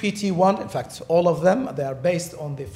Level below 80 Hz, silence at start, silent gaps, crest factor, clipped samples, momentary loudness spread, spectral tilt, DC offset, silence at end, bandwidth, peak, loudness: -56 dBFS; 0 s; none; 16 dB; under 0.1%; 11 LU; -6 dB/octave; under 0.1%; 0 s; 15 kHz; -6 dBFS; -22 LUFS